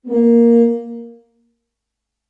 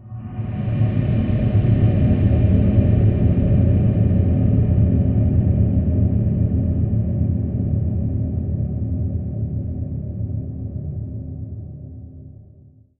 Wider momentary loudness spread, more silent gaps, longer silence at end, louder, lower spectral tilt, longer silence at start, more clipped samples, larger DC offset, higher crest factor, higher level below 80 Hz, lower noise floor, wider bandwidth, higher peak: first, 21 LU vs 13 LU; neither; first, 1.2 s vs 0.65 s; first, -13 LUFS vs -19 LUFS; second, -10 dB/octave vs -11.5 dB/octave; about the same, 0.05 s vs 0 s; neither; neither; about the same, 12 dB vs 14 dB; second, -70 dBFS vs -28 dBFS; first, -79 dBFS vs -48 dBFS; about the same, 3 kHz vs 3.3 kHz; about the same, -4 dBFS vs -4 dBFS